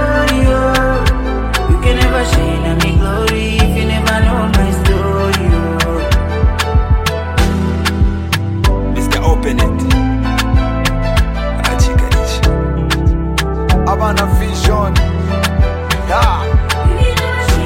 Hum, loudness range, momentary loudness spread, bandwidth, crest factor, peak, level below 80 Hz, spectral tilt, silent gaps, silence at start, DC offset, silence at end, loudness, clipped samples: none; 1 LU; 3 LU; 16.5 kHz; 12 dB; 0 dBFS; -16 dBFS; -5.5 dB/octave; none; 0 s; under 0.1%; 0 s; -14 LUFS; under 0.1%